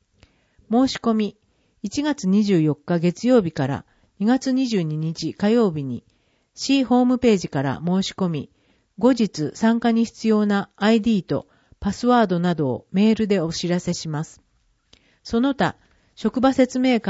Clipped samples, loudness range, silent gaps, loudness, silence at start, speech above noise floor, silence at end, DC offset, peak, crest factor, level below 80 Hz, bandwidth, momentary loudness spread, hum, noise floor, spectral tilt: under 0.1%; 3 LU; none; -21 LUFS; 0.7 s; 40 dB; 0 s; under 0.1%; -4 dBFS; 16 dB; -52 dBFS; 8 kHz; 10 LU; none; -60 dBFS; -6 dB/octave